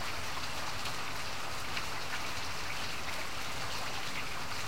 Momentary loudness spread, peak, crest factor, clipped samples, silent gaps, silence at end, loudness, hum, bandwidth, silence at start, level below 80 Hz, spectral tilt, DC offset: 1 LU; -20 dBFS; 18 dB; under 0.1%; none; 0 s; -37 LUFS; none; 16 kHz; 0 s; -54 dBFS; -2 dB/octave; 2%